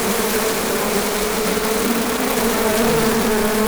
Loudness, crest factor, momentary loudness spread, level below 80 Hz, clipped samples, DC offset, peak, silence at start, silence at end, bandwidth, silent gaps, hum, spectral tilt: -18 LUFS; 14 dB; 2 LU; -38 dBFS; under 0.1%; under 0.1%; -4 dBFS; 0 s; 0 s; over 20 kHz; none; none; -3 dB/octave